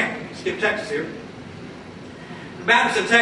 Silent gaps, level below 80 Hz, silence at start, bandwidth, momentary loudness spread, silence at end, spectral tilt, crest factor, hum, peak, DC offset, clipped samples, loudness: none; -58 dBFS; 0 s; 11.5 kHz; 21 LU; 0 s; -3.5 dB/octave; 20 dB; none; -4 dBFS; under 0.1%; under 0.1%; -21 LUFS